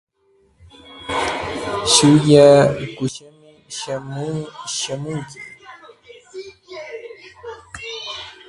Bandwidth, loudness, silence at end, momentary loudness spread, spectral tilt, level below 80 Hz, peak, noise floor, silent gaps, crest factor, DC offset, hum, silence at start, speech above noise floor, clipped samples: 11.5 kHz; -17 LUFS; 0.15 s; 25 LU; -4.5 dB/octave; -50 dBFS; 0 dBFS; -59 dBFS; none; 20 dB; under 0.1%; none; 0.9 s; 43 dB; under 0.1%